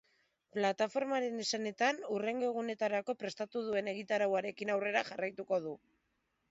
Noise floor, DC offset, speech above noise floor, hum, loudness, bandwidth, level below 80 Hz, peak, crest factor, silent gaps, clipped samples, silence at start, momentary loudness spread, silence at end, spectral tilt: -81 dBFS; under 0.1%; 45 dB; none; -36 LUFS; 7.6 kHz; -82 dBFS; -18 dBFS; 18 dB; none; under 0.1%; 0.55 s; 7 LU; 0.75 s; -2.5 dB/octave